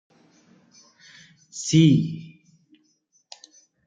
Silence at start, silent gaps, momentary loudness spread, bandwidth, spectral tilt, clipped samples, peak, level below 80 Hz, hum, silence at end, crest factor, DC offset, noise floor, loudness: 1.55 s; none; 28 LU; 9.2 kHz; -6 dB/octave; under 0.1%; -4 dBFS; -64 dBFS; none; 1.6 s; 22 dB; under 0.1%; -67 dBFS; -20 LUFS